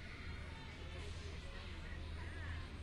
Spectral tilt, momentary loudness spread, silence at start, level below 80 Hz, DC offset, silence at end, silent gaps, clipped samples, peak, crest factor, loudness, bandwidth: -5 dB/octave; 3 LU; 0 s; -52 dBFS; under 0.1%; 0 s; none; under 0.1%; -36 dBFS; 12 dB; -50 LUFS; 11.5 kHz